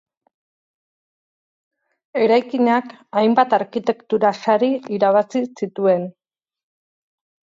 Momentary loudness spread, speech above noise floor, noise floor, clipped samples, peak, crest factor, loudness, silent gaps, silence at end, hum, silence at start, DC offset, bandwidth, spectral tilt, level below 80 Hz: 7 LU; over 72 dB; under -90 dBFS; under 0.1%; -4 dBFS; 18 dB; -19 LUFS; none; 1.45 s; none; 2.15 s; under 0.1%; 7.6 kHz; -6.5 dB/octave; -74 dBFS